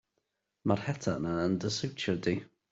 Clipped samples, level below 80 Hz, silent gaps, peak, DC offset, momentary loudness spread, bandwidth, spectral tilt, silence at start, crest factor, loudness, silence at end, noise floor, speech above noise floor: under 0.1%; -64 dBFS; none; -12 dBFS; under 0.1%; 3 LU; 8 kHz; -5.5 dB/octave; 0.65 s; 22 dB; -33 LUFS; 0.25 s; -82 dBFS; 50 dB